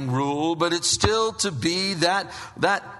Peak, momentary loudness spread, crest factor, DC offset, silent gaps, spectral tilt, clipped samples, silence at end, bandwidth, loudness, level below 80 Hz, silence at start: -2 dBFS; 5 LU; 22 dB; under 0.1%; none; -3.5 dB/octave; under 0.1%; 0 s; 11.5 kHz; -23 LUFS; -46 dBFS; 0 s